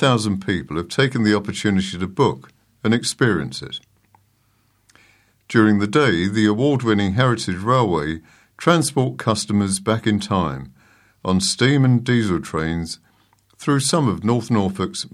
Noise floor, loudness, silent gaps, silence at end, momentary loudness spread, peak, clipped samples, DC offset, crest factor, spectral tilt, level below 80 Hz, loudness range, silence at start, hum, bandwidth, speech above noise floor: -62 dBFS; -19 LUFS; none; 0.05 s; 10 LU; 0 dBFS; under 0.1%; under 0.1%; 20 dB; -5.5 dB/octave; -48 dBFS; 4 LU; 0 s; none; 13.5 kHz; 43 dB